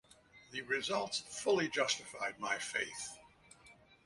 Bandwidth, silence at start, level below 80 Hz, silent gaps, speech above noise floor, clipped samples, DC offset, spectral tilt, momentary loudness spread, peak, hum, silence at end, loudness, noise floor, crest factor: 11.5 kHz; 0.35 s; -74 dBFS; none; 25 dB; under 0.1%; under 0.1%; -2 dB/octave; 12 LU; -18 dBFS; none; 0.35 s; -37 LUFS; -63 dBFS; 20 dB